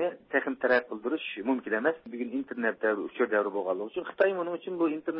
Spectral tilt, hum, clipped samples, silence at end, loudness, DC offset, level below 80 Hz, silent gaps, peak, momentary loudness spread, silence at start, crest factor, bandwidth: -8.5 dB/octave; none; under 0.1%; 0 s; -30 LUFS; under 0.1%; -78 dBFS; none; -12 dBFS; 7 LU; 0 s; 18 dB; 5.6 kHz